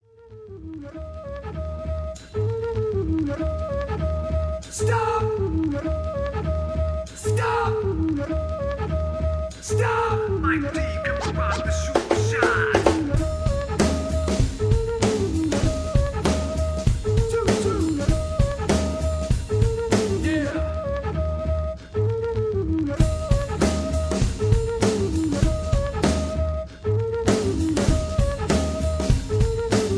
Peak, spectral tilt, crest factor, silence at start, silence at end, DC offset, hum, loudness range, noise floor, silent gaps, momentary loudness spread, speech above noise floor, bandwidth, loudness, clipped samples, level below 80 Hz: -2 dBFS; -6 dB/octave; 20 dB; 0.25 s; 0 s; under 0.1%; none; 3 LU; -44 dBFS; none; 6 LU; 21 dB; 11 kHz; -24 LUFS; under 0.1%; -28 dBFS